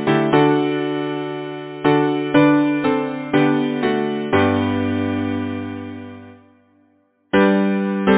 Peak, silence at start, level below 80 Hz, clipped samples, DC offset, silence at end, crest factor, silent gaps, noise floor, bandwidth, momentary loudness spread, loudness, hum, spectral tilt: 0 dBFS; 0 s; -48 dBFS; under 0.1%; under 0.1%; 0 s; 18 dB; none; -59 dBFS; 4 kHz; 13 LU; -18 LUFS; none; -11 dB/octave